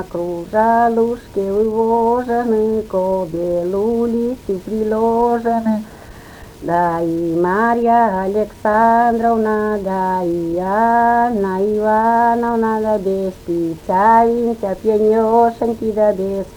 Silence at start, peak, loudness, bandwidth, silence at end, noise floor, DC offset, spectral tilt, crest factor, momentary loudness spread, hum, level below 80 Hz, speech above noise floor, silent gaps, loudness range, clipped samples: 0 s; 0 dBFS; -16 LUFS; over 20 kHz; 0 s; -37 dBFS; under 0.1%; -7.5 dB/octave; 16 dB; 8 LU; none; -44 dBFS; 21 dB; none; 3 LU; under 0.1%